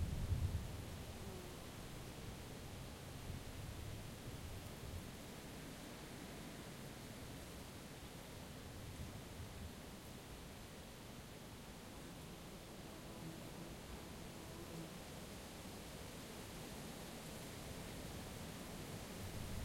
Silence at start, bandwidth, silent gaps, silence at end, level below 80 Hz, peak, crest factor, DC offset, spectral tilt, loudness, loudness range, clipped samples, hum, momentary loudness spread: 0 s; 16.5 kHz; none; 0 s; -58 dBFS; -28 dBFS; 22 dB; under 0.1%; -4.5 dB/octave; -51 LUFS; 3 LU; under 0.1%; none; 4 LU